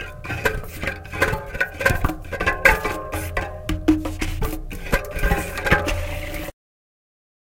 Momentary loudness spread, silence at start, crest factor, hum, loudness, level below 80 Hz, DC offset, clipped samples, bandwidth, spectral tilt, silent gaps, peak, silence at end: 12 LU; 0 s; 24 dB; none; -23 LUFS; -30 dBFS; under 0.1%; under 0.1%; 17 kHz; -5 dB/octave; none; 0 dBFS; 0.95 s